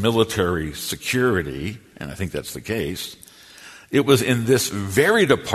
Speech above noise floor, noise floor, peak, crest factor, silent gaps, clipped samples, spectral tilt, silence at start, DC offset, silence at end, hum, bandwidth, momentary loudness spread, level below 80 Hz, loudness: 24 dB; -44 dBFS; -2 dBFS; 20 dB; none; under 0.1%; -4.5 dB/octave; 0 s; under 0.1%; 0 s; none; 13.5 kHz; 15 LU; -46 dBFS; -21 LUFS